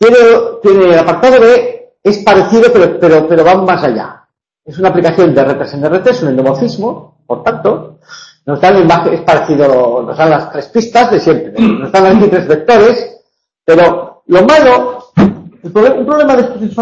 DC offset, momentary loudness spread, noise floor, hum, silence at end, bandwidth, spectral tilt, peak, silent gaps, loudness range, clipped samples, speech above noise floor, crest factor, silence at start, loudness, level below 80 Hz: under 0.1%; 11 LU; -51 dBFS; none; 0 s; 8 kHz; -6.5 dB/octave; 0 dBFS; none; 5 LU; 0.5%; 43 dB; 8 dB; 0 s; -8 LUFS; -44 dBFS